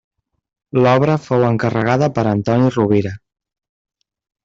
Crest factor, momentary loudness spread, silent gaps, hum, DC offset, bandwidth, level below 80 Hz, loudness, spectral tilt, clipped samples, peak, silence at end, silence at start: 16 dB; 5 LU; none; none; under 0.1%; 7.6 kHz; -52 dBFS; -16 LUFS; -8 dB/octave; under 0.1%; -2 dBFS; 1.3 s; 0.75 s